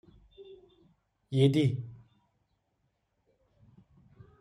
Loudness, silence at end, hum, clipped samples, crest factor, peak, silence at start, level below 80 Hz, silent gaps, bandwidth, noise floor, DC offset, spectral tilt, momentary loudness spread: -28 LUFS; 2.45 s; none; under 0.1%; 22 dB; -12 dBFS; 0.4 s; -66 dBFS; none; 10.5 kHz; -78 dBFS; under 0.1%; -8 dB/octave; 28 LU